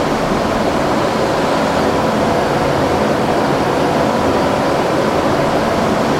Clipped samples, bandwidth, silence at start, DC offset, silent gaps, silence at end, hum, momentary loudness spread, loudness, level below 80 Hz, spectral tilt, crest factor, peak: under 0.1%; 16.5 kHz; 0 s; under 0.1%; none; 0 s; none; 1 LU; -15 LUFS; -36 dBFS; -5.5 dB/octave; 14 dB; -2 dBFS